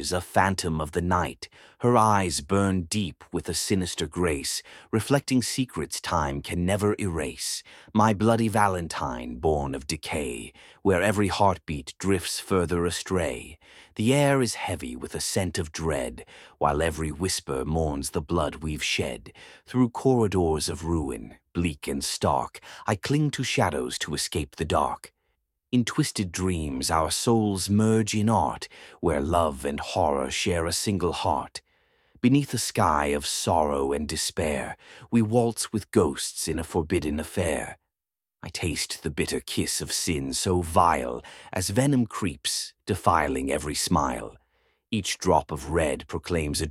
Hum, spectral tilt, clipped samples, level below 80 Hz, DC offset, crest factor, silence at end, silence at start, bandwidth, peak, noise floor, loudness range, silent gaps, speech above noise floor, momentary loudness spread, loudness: none; -4.5 dB/octave; under 0.1%; -44 dBFS; under 0.1%; 22 dB; 0 s; 0 s; 16.5 kHz; -4 dBFS; under -90 dBFS; 3 LU; none; over 64 dB; 9 LU; -26 LUFS